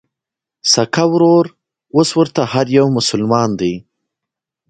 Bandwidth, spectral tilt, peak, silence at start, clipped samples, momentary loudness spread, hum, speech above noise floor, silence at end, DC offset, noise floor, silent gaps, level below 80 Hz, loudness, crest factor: 9.4 kHz; -4.5 dB/octave; 0 dBFS; 0.65 s; under 0.1%; 8 LU; none; 71 dB; 0.9 s; under 0.1%; -85 dBFS; none; -54 dBFS; -14 LUFS; 16 dB